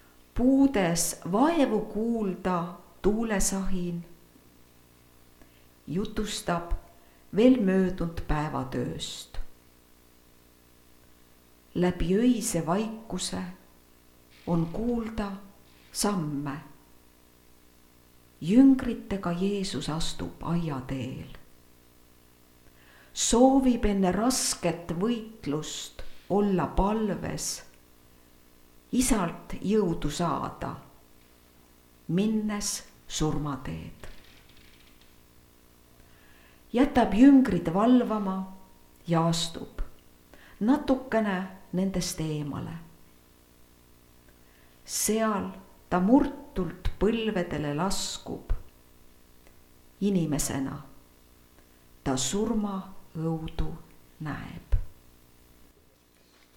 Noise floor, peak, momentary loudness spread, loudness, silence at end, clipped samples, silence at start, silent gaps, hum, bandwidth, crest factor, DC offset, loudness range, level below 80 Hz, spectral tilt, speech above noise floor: -61 dBFS; -6 dBFS; 17 LU; -28 LUFS; 1.6 s; under 0.1%; 0.35 s; none; 60 Hz at -55 dBFS; 18.5 kHz; 22 dB; under 0.1%; 10 LU; -42 dBFS; -5 dB/octave; 34 dB